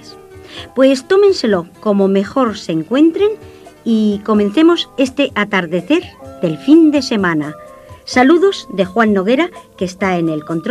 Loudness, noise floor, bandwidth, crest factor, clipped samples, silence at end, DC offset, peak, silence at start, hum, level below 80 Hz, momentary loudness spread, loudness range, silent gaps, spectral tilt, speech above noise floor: -14 LUFS; -36 dBFS; 12 kHz; 14 dB; under 0.1%; 0 s; under 0.1%; 0 dBFS; 0.05 s; none; -52 dBFS; 11 LU; 2 LU; none; -6 dB/octave; 23 dB